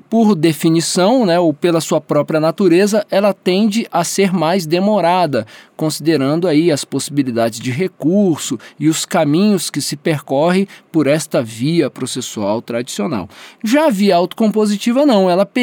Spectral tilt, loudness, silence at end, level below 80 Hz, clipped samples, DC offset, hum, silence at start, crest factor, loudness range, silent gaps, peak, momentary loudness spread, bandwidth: -5.5 dB/octave; -15 LUFS; 0 s; -66 dBFS; under 0.1%; under 0.1%; none; 0.1 s; 14 dB; 3 LU; none; -2 dBFS; 8 LU; 19 kHz